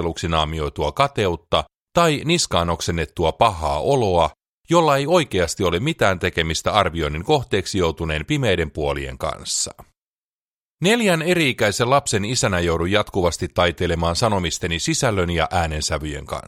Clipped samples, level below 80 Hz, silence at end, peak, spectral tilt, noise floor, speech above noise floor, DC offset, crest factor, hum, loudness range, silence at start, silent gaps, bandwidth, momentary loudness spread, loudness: under 0.1%; -38 dBFS; 0.05 s; -2 dBFS; -4 dB/octave; under -90 dBFS; over 70 dB; under 0.1%; 20 dB; none; 3 LU; 0 s; 1.76-1.86 s, 4.48-4.61 s, 10.01-10.77 s; 16 kHz; 6 LU; -20 LUFS